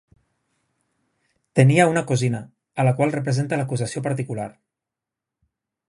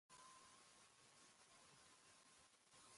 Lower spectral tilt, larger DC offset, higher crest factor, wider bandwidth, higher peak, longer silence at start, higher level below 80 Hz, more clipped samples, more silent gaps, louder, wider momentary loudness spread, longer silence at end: first, -6.5 dB/octave vs -1 dB/octave; neither; first, 22 dB vs 14 dB; about the same, 11.5 kHz vs 11.5 kHz; first, 0 dBFS vs -54 dBFS; first, 1.55 s vs 0.1 s; first, -62 dBFS vs under -90 dBFS; neither; neither; first, -21 LUFS vs -67 LUFS; first, 15 LU vs 4 LU; first, 1.4 s vs 0 s